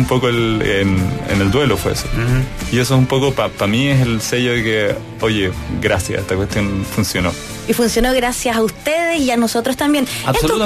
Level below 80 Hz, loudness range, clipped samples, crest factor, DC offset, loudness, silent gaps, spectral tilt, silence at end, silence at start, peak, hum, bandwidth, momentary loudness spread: -32 dBFS; 2 LU; under 0.1%; 14 dB; under 0.1%; -16 LUFS; none; -5 dB/octave; 0 s; 0 s; -2 dBFS; none; 14 kHz; 5 LU